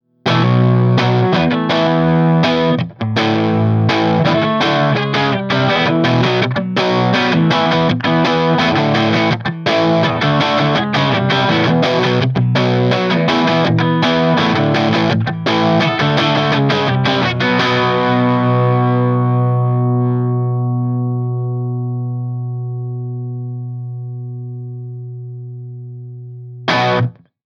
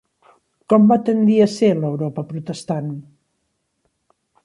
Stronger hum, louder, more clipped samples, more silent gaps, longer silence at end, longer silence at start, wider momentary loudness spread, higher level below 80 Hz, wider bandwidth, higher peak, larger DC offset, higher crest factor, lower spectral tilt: first, 60 Hz at -40 dBFS vs none; first, -14 LUFS vs -18 LUFS; neither; neither; second, 0.35 s vs 1.45 s; second, 0.25 s vs 0.7 s; about the same, 13 LU vs 14 LU; first, -50 dBFS vs -62 dBFS; second, 7 kHz vs 11.5 kHz; about the same, 0 dBFS vs -2 dBFS; neither; about the same, 14 dB vs 16 dB; about the same, -7 dB/octave vs -7.5 dB/octave